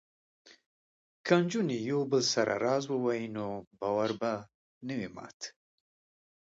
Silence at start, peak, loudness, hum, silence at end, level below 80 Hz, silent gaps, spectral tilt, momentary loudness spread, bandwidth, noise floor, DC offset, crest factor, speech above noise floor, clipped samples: 1.25 s; -10 dBFS; -31 LUFS; none; 1 s; -74 dBFS; 3.67-3.71 s, 4.54-4.81 s, 5.34-5.40 s; -4.5 dB/octave; 15 LU; 8 kHz; under -90 dBFS; under 0.1%; 22 dB; over 59 dB; under 0.1%